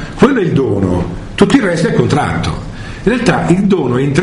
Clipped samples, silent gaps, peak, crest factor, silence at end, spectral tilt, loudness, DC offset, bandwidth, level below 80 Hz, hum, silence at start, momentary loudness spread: 0.3%; none; 0 dBFS; 12 dB; 0 s; -6.5 dB/octave; -13 LUFS; under 0.1%; 11 kHz; -30 dBFS; none; 0 s; 8 LU